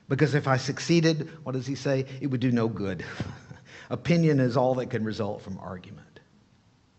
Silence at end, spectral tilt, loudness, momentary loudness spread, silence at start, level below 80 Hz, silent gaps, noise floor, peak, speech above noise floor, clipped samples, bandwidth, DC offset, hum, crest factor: 0.95 s; -6.5 dB/octave; -27 LUFS; 16 LU; 0.1 s; -62 dBFS; none; -62 dBFS; -8 dBFS; 35 dB; under 0.1%; 8.4 kHz; under 0.1%; none; 20 dB